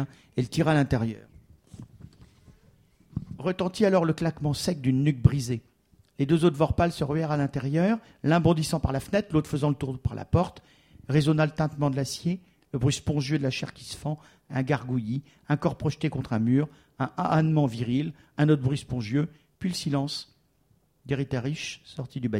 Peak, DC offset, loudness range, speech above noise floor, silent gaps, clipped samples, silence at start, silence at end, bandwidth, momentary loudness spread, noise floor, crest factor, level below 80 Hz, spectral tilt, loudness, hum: -4 dBFS; under 0.1%; 5 LU; 40 dB; none; under 0.1%; 0 s; 0 s; 14.5 kHz; 12 LU; -66 dBFS; 22 dB; -48 dBFS; -6.5 dB/octave; -27 LUFS; none